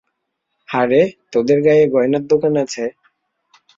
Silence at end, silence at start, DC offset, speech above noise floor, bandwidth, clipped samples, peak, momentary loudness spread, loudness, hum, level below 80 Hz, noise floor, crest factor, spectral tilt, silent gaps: 0.9 s; 0.7 s; under 0.1%; 59 dB; 7.6 kHz; under 0.1%; -2 dBFS; 11 LU; -16 LUFS; none; -60 dBFS; -74 dBFS; 14 dB; -6.5 dB/octave; none